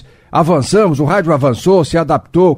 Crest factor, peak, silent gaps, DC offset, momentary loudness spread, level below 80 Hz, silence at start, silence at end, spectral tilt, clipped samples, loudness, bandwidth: 12 dB; 0 dBFS; none; under 0.1%; 3 LU; -40 dBFS; 0.35 s; 0 s; -6.5 dB/octave; under 0.1%; -12 LUFS; 15.5 kHz